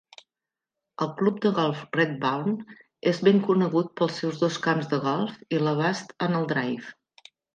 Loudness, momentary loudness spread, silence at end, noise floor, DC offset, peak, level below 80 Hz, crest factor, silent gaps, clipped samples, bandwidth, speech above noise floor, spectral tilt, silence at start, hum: -26 LUFS; 10 LU; 0.65 s; -89 dBFS; under 0.1%; -6 dBFS; -74 dBFS; 20 dB; none; under 0.1%; 9.2 kHz; 64 dB; -6.5 dB/octave; 1 s; none